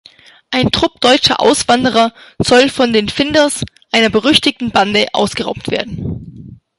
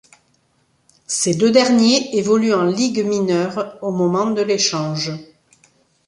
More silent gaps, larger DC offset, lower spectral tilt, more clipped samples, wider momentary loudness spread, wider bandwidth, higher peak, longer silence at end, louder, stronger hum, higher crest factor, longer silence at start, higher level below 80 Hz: neither; neither; about the same, -3.5 dB/octave vs -4 dB/octave; neither; about the same, 10 LU vs 11 LU; first, 16 kHz vs 11.5 kHz; about the same, 0 dBFS vs -2 dBFS; second, 0.25 s vs 0.85 s; first, -13 LUFS vs -17 LUFS; neither; about the same, 14 dB vs 18 dB; second, 0.5 s vs 1.1 s; first, -40 dBFS vs -62 dBFS